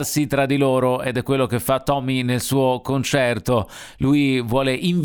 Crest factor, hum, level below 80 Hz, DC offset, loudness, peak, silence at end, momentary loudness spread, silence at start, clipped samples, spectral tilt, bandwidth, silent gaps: 16 dB; none; -46 dBFS; under 0.1%; -20 LUFS; -4 dBFS; 0 s; 4 LU; 0 s; under 0.1%; -5.5 dB/octave; over 20 kHz; none